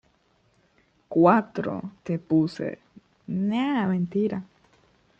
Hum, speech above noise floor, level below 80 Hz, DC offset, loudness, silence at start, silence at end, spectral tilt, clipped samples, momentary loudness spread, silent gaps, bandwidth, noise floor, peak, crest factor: none; 41 dB; -66 dBFS; under 0.1%; -25 LUFS; 1.1 s; 0.75 s; -8.5 dB/octave; under 0.1%; 15 LU; none; 7.8 kHz; -65 dBFS; -4 dBFS; 22 dB